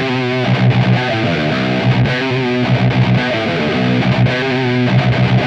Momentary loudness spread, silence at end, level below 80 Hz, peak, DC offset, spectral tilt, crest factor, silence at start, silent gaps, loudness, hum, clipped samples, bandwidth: 3 LU; 0 s; -40 dBFS; -2 dBFS; under 0.1%; -7.5 dB/octave; 12 dB; 0 s; none; -14 LUFS; none; under 0.1%; 7.2 kHz